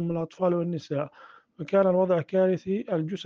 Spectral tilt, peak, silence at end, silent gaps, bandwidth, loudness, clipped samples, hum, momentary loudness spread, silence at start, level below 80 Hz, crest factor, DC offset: -8.5 dB/octave; -10 dBFS; 0 s; none; 7 kHz; -26 LUFS; under 0.1%; none; 10 LU; 0 s; -70 dBFS; 16 dB; under 0.1%